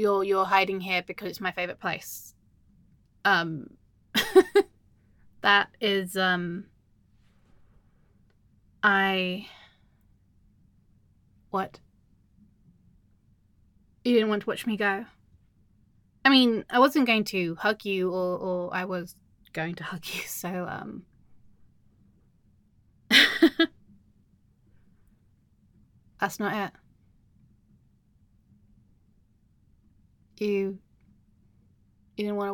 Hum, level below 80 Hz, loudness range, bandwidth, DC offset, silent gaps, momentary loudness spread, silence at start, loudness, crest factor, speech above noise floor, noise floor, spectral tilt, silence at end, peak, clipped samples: none; -66 dBFS; 13 LU; 17.5 kHz; under 0.1%; none; 17 LU; 0 s; -25 LUFS; 24 dB; 38 dB; -64 dBFS; -4 dB/octave; 0 s; -4 dBFS; under 0.1%